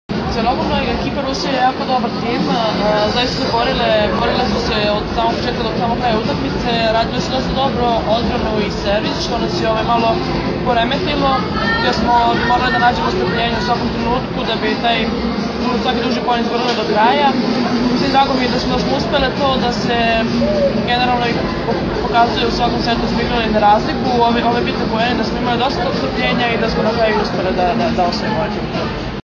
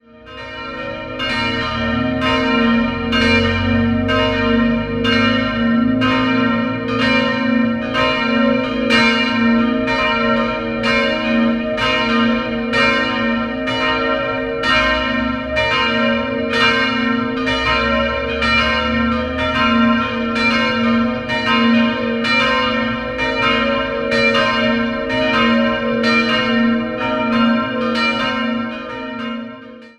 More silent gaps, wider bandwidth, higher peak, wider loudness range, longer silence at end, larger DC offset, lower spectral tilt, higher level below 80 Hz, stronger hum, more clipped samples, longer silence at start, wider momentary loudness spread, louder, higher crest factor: neither; second, 7.2 kHz vs 9.8 kHz; about the same, 0 dBFS vs -2 dBFS; about the same, 2 LU vs 1 LU; about the same, 0.05 s vs 0.1 s; neither; about the same, -5.5 dB/octave vs -5.5 dB/octave; about the same, -32 dBFS vs -36 dBFS; neither; neither; second, 0.1 s vs 0.25 s; about the same, 5 LU vs 6 LU; about the same, -16 LUFS vs -16 LUFS; about the same, 14 dB vs 16 dB